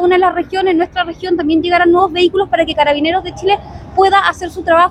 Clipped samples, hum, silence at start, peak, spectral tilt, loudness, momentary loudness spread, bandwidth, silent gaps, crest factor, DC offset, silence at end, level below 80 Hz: under 0.1%; none; 0 s; 0 dBFS; -5 dB/octave; -13 LUFS; 7 LU; 10.5 kHz; none; 12 dB; under 0.1%; 0 s; -40 dBFS